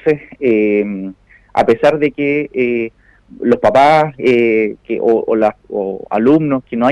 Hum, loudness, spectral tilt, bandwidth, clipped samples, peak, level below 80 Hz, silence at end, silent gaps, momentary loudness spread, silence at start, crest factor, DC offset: none; -14 LUFS; -7.5 dB/octave; 11 kHz; under 0.1%; -2 dBFS; -50 dBFS; 0 s; none; 10 LU; 0.05 s; 12 dB; under 0.1%